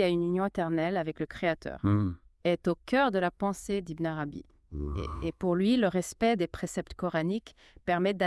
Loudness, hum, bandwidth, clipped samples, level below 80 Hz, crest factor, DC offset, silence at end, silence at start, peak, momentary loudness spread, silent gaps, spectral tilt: -30 LUFS; none; 12 kHz; under 0.1%; -50 dBFS; 16 dB; under 0.1%; 0 s; 0 s; -14 dBFS; 10 LU; none; -6.5 dB/octave